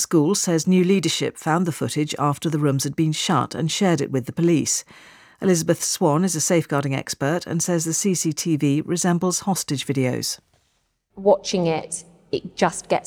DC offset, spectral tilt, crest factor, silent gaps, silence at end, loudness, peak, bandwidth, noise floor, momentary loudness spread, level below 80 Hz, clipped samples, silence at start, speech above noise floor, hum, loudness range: under 0.1%; -4.5 dB/octave; 16 dB; none; 0.05 s; -21 LUFS; -6 dBFS; 19 kHz; -69 dBFS; 6 LU; -62 dBFS; under 0.1%; 0 s; 47 dB; none; 2 LU